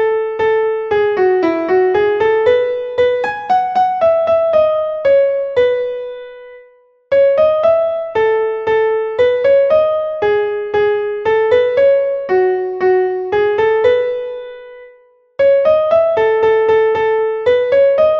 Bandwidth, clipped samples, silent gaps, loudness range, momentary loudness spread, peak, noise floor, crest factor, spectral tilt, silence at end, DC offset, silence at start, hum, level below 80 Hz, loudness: 6.4 kHz; under 0.1%; none; 2 LU; 6 LU; -2 dBFS; -48 dBFS; 12 dB; -6.5 dB/octave; 0 s; under 0.1%; 0 s; none; -52 dBFS; -14 LUFS